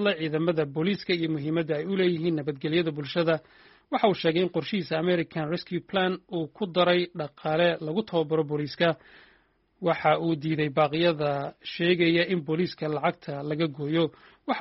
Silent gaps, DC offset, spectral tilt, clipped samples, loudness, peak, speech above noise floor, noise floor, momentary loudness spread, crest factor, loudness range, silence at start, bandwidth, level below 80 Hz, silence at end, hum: none; under 0.1%; -4.5 dB/octave; under 0.1%; -27 LUFS; -8 dBFS; 38 dB; -65 dBFS; 8 LU; 18 dB; 2 LU; 0 s; 5.8 kHz; -66 dBFS; 0 s; none